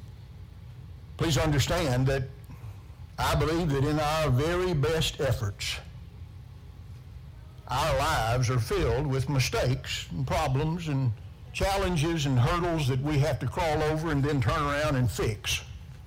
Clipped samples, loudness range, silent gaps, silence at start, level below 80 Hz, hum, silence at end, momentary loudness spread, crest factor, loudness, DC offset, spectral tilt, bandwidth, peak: under 0.1%; 4 LU; none; 0 s; -40 dBFS; none; 0 s; 20 LU; 14 dB; -28 LUFS; under 0.1%; -5.5 dB/octave; 16.5 kHz; -14 dBFS